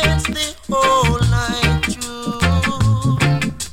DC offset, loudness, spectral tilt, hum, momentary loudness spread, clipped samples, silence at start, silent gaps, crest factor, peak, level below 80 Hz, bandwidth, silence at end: under 0.1%; -17 LUFS; -5 dB/octave; none; 7 LU; under 0.1%; 0 s; none; 14 dB; -2 dBFS; -28 dBFS; 16.5 kHz; 0 s